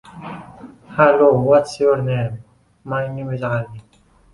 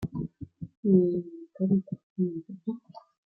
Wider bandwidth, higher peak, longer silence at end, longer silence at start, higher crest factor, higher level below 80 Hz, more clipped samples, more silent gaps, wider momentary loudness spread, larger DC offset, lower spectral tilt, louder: first, 11.5 kHz vs 4.8 kHz; first, -2 dBFS vs -10 dBFS; first, 0.55 s vs 0.3 s; first, 0.15 s vs 0 s; about the same, 18 dB vs 20 dB; first, -52 dBFS vs -60 dBFS; neither; second, none vs 0.77-0.83 s, 2.03-2.16 s; about the same, 21 LU vs 19 LU; neither; second, -7.5 dB/octave vs -12.5 dB/octave; first, -18 LUFS vs -29 LUFS